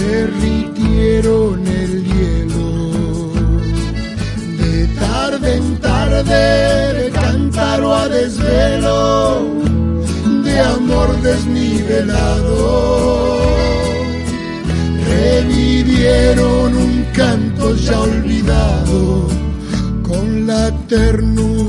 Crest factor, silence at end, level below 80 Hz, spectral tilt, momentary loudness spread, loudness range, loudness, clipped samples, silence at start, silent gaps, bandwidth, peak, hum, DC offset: 12 dB; 0 s; -20 dBFS; -6.5 dB/octave; 6 LU; 3 LU; -14 LUFS; under 0.1%; 0 s; none; 11.5 kHz; 0 dBFS; none; under 0.1%